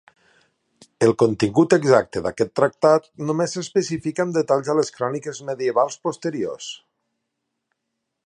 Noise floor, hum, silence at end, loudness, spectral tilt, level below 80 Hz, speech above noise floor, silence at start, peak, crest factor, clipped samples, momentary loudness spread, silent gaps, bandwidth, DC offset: -79 dBFS; none; 1.5 s; -21 LUFS; -5.5 dB/octave; -58 dBFS; 58 dB; 1 s; -2 dBFS; 20 dB; under 0.1%; 11 LU; none; 11 kHz; under 0.1%